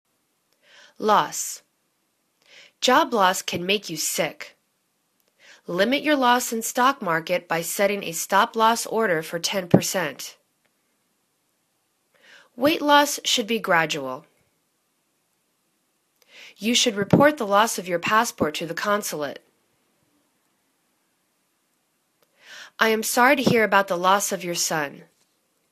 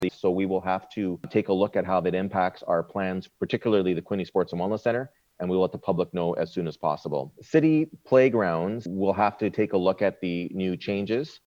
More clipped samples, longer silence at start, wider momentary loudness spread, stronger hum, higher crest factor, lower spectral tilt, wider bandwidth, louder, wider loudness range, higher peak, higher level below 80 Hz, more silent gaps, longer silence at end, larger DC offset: neither; first, 1 s vs 0 s; first, 13 LU vs 8 LU; neither; first, 24 dB vs 18 dB; second, -3 dB/octave vs -8 dB/octave; first, 14 kHz vs 7.6 kHz; first, -21 LUFS vs -26 LUFS; first, 7 LU vs 4 LU; first, 0 dBFS vs -8 dBFS; about the same, -64 dBFS vs -64 dBFS; neither; first, 0.7 s vs 0.1 s; neither